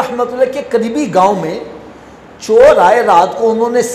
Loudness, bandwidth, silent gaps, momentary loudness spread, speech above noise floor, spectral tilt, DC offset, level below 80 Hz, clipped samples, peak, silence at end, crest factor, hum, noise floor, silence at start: -11 LUFS; 14 kHz; none; 14 LU; 25 dB; -5 dB/octave; under 0.1%; -46 dBFS; under 0.1%; 0 dBFS; 0 s; 12 dB; none; -36 dBFS; 0 s